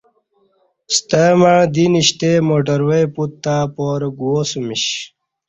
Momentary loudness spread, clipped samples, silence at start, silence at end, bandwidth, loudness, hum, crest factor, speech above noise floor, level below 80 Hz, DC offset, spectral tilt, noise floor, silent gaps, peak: 9 LU; under 0.1%; 0.9 s; 0.4 s; 8.4 kHz; -15 LUFS; none; 14 dB; 45 dB; -54 dBFS; under 0.1%; -4.5 dB/octave; -60 dBFS; none; -2 dBFS